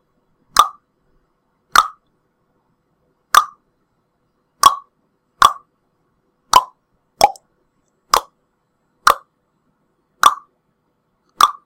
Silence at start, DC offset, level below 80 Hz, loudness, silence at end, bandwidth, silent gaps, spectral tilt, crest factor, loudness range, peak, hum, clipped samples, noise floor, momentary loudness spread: 0.55 s; under 0.1%; -50 dBFS; -16 LUFS; 0.15 s; over 20 kHz; none; 0.5 dB/octave; 20 dB; 3 LU; 0 dBFS; none; 0.2%; -67 dBFS; 12 LU